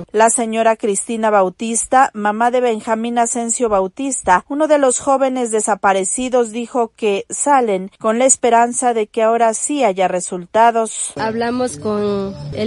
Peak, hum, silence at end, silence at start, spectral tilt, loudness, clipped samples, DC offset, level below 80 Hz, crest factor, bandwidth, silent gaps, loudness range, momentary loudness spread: 0 dBFS; none; 0 s; 0 s; -3.5 dB/octave; -16 LUFS; under 0.1%; under 0.1%; -52 dBFS; 16 dB; 11.5 kHz; none; 2 LU; 7 LU